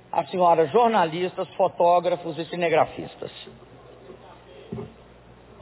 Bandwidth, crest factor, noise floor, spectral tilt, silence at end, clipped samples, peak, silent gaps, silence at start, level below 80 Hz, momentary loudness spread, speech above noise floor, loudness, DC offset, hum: 4 kHz; 18 dB; -49 dBFS; -9.5 dB/octave; 0.75 s; under 0.1%; -8 dBFS; none; 0.15 s; -60 dBFS; 19 LU; 27 dB; -22 LUFS; under 0.1%; none